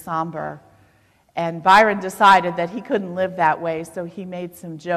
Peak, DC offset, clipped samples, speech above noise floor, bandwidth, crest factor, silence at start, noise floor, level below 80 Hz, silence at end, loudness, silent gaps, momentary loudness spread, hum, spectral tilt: -2 dBFS; under 0.1%; under 0.1%; 38 dB; 14 kHz; 18 dB; 0 s; -58 dBFS; -60 dBFS; 0 s; -18 LUFS; none; 18 LU; none; -5 dB/octave